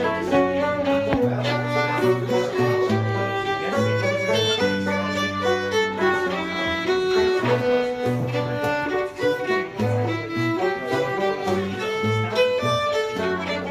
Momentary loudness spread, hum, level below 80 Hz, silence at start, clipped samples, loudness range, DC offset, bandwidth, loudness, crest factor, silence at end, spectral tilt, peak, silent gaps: 4 LU; none; -52 dBFS; 0 s; under 0.1%; 2 LU; under 0.1%; 15.5 kHz; -22 LUFS; 14 dB; 0 s; -5.5 dB/octave; -8 dBFS; none